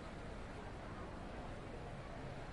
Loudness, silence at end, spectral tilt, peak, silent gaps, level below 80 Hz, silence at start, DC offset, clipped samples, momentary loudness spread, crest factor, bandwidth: -50 LUFS; 0 s; -6.5 dB/octave; -38 dBFS; none; -54 dBFS; 0 s; under 0.1%; under 0.1%; 1 LU; 12 dB; 11.5 kHz